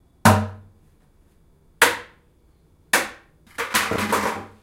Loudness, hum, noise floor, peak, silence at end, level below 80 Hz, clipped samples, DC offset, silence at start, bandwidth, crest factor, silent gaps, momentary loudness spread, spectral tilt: -21 LUFS; none; -57 dBFS; 0 dBFS; 0.15 s; -52 dBFS; under 0.1%; under 0.1%; 0.25 s; 16.5 kHz; 24 dB; none; 15 LU; -3.5 dB/octave